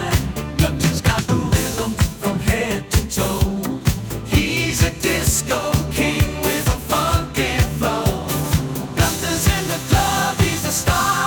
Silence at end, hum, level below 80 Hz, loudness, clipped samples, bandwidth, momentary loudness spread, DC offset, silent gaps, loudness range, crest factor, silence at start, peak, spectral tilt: 0 s; none; -28 dBFS; -19 LUFS; under 0.1%; 19.5 kHz; 4 LU; under 0.1%; none; 1 LU; 16 dB; 0 s; -4 dBFS; -4.5 dB/octave